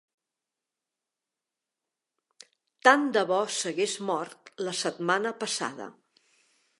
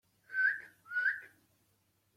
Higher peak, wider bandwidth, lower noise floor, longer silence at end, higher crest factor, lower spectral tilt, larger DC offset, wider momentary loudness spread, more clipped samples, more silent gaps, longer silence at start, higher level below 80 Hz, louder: first, -2 dBFS vs -22 dBFS; second, 11.5 kHz vs 15.5 kHz; first, -88 dBFS vs -75 dBFS; about the same, 0.9 s vs 0.9 s; first, 28 dB vs 16 dB; first, -2.5 dB/octave vs -1 dB/octave; neither; first, 15 LU vs 11 LU; neither; neither; first, 2.85 s vs 0.3 s; about the same, -86 dBFS vs -88 dBFS; first, -27 LUFS vs -34 LUFS